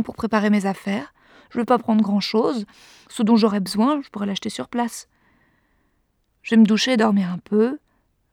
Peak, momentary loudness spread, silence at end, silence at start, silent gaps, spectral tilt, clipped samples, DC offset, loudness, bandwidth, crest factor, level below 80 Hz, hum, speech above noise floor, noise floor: -4 dBFS; 14 LU; 0.55 s; 0 s; none; -5.5 dB/octave; under 0.1%; under 0.1%; -20 LUFS; 13.5 kHz; 18 dB; -62 dBFS; none; 47 dB; -67 dBFS